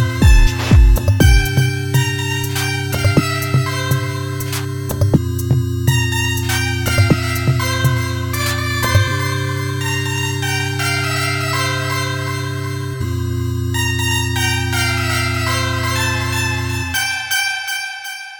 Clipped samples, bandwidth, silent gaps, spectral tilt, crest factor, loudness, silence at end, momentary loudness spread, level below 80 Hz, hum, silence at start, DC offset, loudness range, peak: under 0.1%; 19.5 kHz; none; -4.5 dB/octave; 16 dB; -17 LUFS; 0 s; 8 LU; -22 dBFS; none; 0 s; under 0.1%; 3 LU; 0 dBFS